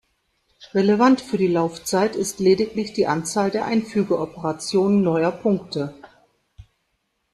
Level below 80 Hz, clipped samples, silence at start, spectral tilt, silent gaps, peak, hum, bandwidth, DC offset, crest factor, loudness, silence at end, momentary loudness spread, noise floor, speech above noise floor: -58 dBFS; under 0.1%; 0.6 s; -5.5 dB/octave; none; -4 dBFS; none; 13 kHz; under 0.1%; 18 dB; -21 LUFS; 0.7 s; 8 LU; -72 dBFS; 52 dB